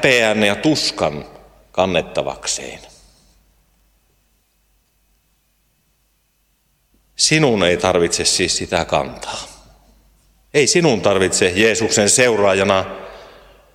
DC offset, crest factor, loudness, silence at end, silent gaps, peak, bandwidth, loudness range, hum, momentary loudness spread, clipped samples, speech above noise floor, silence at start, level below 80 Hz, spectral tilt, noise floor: under 0.1%; 18 dB; -16 LUFS; 0.5 s; none; 0 dBFS; 16 kHz; 10 LU; none; 16 LU; under 0.1%; 47 dB; 0 s; -48 dBFS; -3 dB/octave; -63 dBFS